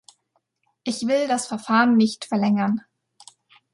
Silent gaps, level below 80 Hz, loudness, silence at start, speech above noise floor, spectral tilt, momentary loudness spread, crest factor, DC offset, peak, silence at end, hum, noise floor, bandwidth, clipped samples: none; -72 dBFS; -21 LUFS; 0.85 s; 51 dB; -5 dB/octave; 11 LU; 18 dB; under 0.1%; -4 dBFS; 0.95 s; none; -71 dBFS; 11.5 kHz; under 0.1%